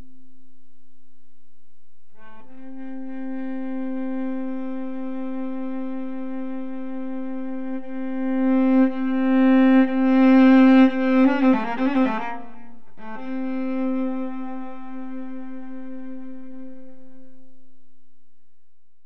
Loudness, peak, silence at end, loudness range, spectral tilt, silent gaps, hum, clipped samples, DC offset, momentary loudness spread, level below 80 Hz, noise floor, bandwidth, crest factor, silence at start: -21 LUFS; -6 dBFS; 0 s; 21 LU; -7.5 dB/octave; none; none; under 0.1%; 3%; 21 LU; -76 dBFS; -70 dBFS; 5.6 kHz; 16 dB; 2.5 s